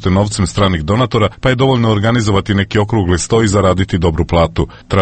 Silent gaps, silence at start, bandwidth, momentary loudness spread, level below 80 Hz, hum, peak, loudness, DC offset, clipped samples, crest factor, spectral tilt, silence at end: none; 0 s; 8.8 kHz; 3 LU; -28 dBFS; none; 0 dBFS; -13 LUFS; under 0.1%; under 0.1%; 12 dB; -6 dB/octave; 0 s